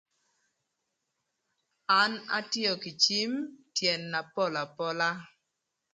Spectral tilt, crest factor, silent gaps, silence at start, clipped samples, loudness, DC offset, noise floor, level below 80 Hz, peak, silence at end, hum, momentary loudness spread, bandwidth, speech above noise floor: -2.5 dB/octave; 24 dB; none; 1.9 s; under 0.1%; -29 LUFS; under 0.1%; -83 dBFS; -82 dBFS; -8 dBFS; 0.65 s; none; 9 LU; 11 kHz; 53 dB